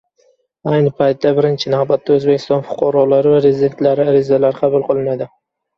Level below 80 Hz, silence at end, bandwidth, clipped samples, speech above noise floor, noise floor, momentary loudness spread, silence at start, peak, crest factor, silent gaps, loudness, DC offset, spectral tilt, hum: -56 dBFS; 0.5 s; 6.6 kHz; under 0.1%; 44 dB; -57 dBFS; 6 LU; 0.65 s; 0 dBFS; 14 dB; none; -14 LUFS; under 0.1%; -8 dB/octave; none